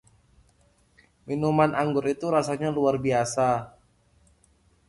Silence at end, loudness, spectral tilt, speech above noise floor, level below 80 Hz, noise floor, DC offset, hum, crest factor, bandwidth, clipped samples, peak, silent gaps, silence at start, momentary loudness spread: 1.2 s; -25 LUFS; -6 dB/octave; 39 dB; -58 dBFS; -63 dBFS; under 0.1%; none; 20 dB; 11.5 kHz; under 0.1%; -8 dBFS; none; 1.25 s; 7 LU